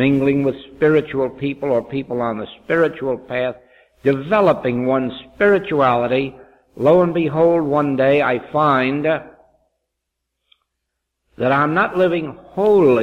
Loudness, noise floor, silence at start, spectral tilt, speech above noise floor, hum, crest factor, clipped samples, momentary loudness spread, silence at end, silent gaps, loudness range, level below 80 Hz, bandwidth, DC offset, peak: -18 LUFS; -78 dBFS; 0 s; -8.5 dB/octave; 61 dB; none; 16 dB; under 0.1%; 8 LU; 0 s; none; 5 LU; -52 dBFS; 7.6 kHz; under 0.1%; -2 dBFS